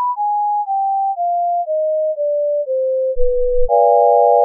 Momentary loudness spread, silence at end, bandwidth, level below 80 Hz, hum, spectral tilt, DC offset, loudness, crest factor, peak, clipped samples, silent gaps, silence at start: 7 LU; 0 s; 1.1 kHz; -30 dBFS; none; -8 dB/octave; under 0.1%; -16 LUFS; 12 dB; -2 dBFS; under 0.1%; none; 0 s